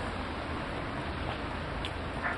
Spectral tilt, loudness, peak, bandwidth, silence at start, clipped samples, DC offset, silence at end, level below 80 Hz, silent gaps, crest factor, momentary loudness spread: -6 dB/octave; -36 LUFS; -18 dBFS; 11.5 kHz; 0 s; under 0.1%; under 0.1%; 0 s; -44 dBFS; none; 18 dB; 1 LU